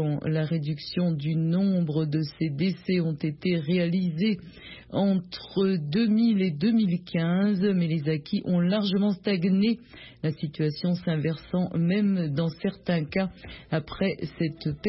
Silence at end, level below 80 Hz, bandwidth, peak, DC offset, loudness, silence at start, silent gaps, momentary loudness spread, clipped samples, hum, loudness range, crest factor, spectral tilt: 0 s; -58 dBFS; 5.8 kHz; -12 dBFS; under 0.1%; -26 LUFS; 0 s; none; 7 LU; under 0.1%; none; 3 LU; 12 dB; -11.5 dB/octave